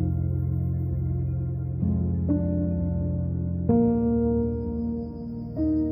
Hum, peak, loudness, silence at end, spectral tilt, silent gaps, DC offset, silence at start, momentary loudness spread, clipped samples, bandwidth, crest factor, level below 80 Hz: none; -10 dBFS; -26 LUFS; 0 s; -15 dB/octave; none; under 0.1%; 0 s; 7 LU; under 0.1%; 2.1 kHz; 16 dB; -36 dBFS